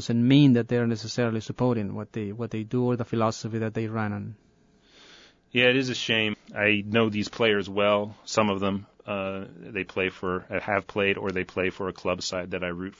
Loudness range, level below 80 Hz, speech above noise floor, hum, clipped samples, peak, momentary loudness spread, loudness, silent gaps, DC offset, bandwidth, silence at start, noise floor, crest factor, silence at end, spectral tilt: 5 LU; -62 dBFS; 34 dB; none; under 0.1%; -6 dBFS; 12 LU; -26 LUFS; none; under 0.1%; 7.8 kHz; 0 s; -60 dBFS; 20 dB; 0.1 s; -5.5 dB/octave